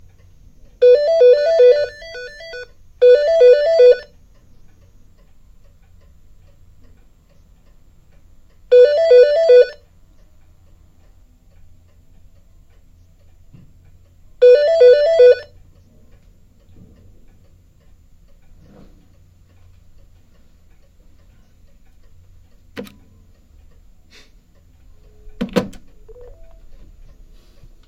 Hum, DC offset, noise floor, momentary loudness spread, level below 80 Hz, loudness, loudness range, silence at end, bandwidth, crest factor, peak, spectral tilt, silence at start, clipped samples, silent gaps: none; under 0.1%; -49 dBFS; 23 LU; -48 dBFS; -12 LUFS; 17 LU; 2.15 s; 7.6 kHz; 18 dB; 0 dBFS; -5 dB/octave; 0.8 s; under 0.1%; none